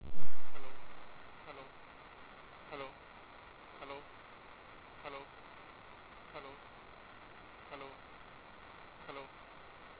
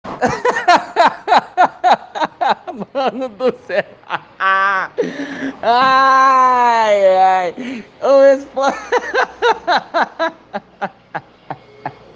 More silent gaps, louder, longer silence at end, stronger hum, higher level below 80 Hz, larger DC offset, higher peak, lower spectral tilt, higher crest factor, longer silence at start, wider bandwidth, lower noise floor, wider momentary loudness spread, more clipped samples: neither; second, -52 LUFS vs -14 LUFS; second, 0 s vs 0.25 s; neither; second, -64 dBFS vs -56 dBFS; neither; second, -14 dBFS vs 0 dBFS; first, -7 dB/octave vs -3.5 dB/octave; about the same, 18 dB vs 16 dB; about the same, 0 s vs 0.05 s; second, 4 kHz vs 9 kHz; first, -55 dBFS vs -33 dBFS; second, 6 LU vs 17 LU; neither